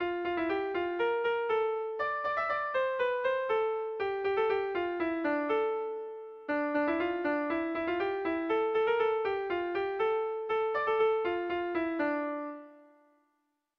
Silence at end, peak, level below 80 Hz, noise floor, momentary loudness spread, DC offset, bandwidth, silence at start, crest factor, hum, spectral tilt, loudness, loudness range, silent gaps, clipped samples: 0.95 s; -18 dBFS; -68 dBFS; -79 dBFS; 5 LU; under 0.1%; 5.8 kHz; 0 s; 14 dB; none; -6.5 dB/octave; -31 LUFS; 2 LU; none; under 0.1%